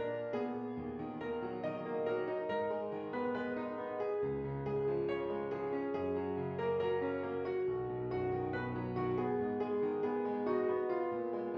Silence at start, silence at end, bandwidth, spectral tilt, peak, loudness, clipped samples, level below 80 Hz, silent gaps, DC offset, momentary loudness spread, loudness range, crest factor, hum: 0 s; 0 s; 5.6 kHz; -6.5 dB/octave; -22 dBFS; -37 LUFS; under 0.1%; -66 dBFS; none; under 0.1%; 5 LU; 2 LU; 14 dB; none